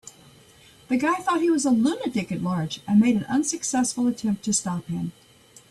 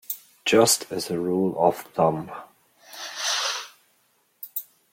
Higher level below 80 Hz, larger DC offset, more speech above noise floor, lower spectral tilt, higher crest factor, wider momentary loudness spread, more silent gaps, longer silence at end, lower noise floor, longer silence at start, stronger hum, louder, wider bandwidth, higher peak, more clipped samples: first, -60 dBFS vs -66 dBFS; neither; second, 30 dB vs 44 dB; first, -4.5 dB/octave vs -3 dB/octave; second, 16 dB vs 22 dB; second, 9 LU vs 20 LU; neither; first, 0.6 s vs 0.3 s; second, -53 dBFS vs -66 dBFS; about the same, 0.05 s vs 0.1 s; neither; about the same, -24 LUFS vs -24 LUFS; second, 13 kHz vs 16.5 kHz; second, -10 dBFS vs -4 dBFS; neither